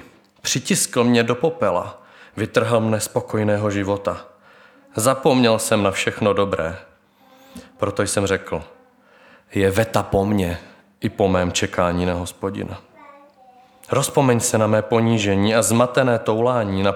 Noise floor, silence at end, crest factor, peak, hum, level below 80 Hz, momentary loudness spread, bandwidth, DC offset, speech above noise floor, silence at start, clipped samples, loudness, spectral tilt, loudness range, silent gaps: -53 dBFS; 0 s; 18 dB; -2 dBFS; none; -50 dBFS; 11 LU; 18.5 kHz; under 0.1%; 34 dB; 0.45 s; under 0.1%; -20 LUFS; -4.5 dB/octave; 5 LU; none